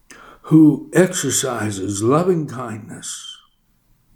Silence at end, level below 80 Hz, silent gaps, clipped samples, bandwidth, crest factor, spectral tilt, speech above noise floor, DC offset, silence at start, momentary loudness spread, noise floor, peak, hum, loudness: 0.8 s; -58 dBFS; none; under 0.1%; 17.5 kHz; 18 dB; -5 dB/octave; 42 dB; under 0.1%; 0.1 s; 18 LU; -60 dBFS; 0 dBFS; none; -17 LUFS